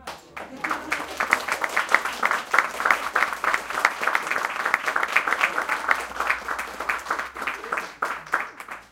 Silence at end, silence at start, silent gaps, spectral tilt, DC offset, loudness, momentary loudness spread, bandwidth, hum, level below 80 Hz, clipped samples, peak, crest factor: 0.05 s; 0 s; none; -1 dB/octave; under 0.1%; -24 LUFS; 8 LU; 17 kHz; none; -58 dBFS; under 0.1%; 0 dBFS; 26 dB